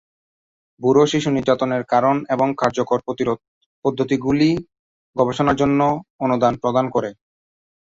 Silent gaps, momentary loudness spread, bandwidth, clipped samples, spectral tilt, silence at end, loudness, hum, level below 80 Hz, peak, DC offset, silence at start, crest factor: 3.48-3.82 s, 4.79-5.13 s, 6.10-6.19 s; 7 LU; 7.8 kHz; under 0.1%; -6.5 dB/octave; 0.8 s; -19 LUFS; none; -52 dBFS; -2 dBFS; under 0.1%; 0.8 s; 18 dB